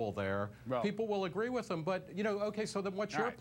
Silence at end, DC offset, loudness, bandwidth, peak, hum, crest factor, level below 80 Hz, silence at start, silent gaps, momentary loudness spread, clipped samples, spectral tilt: 0 s; under 0.1%; -37 LUFS; 16.5 kHz; -22 dBFS; none; 14 dB; -68 dBFS; 0 s; none; 2 LU; under 0.1%; -6 dB/octave